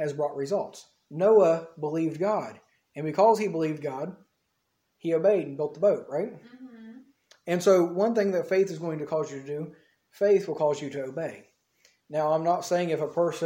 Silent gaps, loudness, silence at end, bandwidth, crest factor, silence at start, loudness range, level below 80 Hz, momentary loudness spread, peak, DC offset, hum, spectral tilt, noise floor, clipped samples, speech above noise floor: none; -26 LUFS; 0 s; 16.5 kHz; 18 dB; 0 s; 4 LU; -78 dBFS; 15 LU; -8 dBFS; under 0.1%; none; -6.5 dB/octave; -76 dBFS; under 0.1%; 50 dB